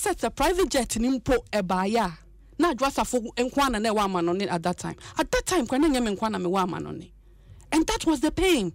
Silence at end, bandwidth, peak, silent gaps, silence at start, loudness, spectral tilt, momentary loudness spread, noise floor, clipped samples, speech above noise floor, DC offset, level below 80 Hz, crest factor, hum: 0 s; 16 kHz; -12 dBFS; none; 0 s; -25 LUFS; -4 dB/octave; 7 LU; -50 dBFS; under 0.1%; 25 dB; under 0.1%; -42 dBFS; 14 dB; none